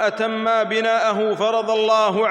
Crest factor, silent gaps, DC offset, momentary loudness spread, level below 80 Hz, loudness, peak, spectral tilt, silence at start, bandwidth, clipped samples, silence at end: 12 dB; none; under 0.1%; 3 LU; -74 dBFS; -19 LUFS; -6 dBFS; -4 dB/octave; 0 s; 9.8 kHz; under 0.1%; 0 s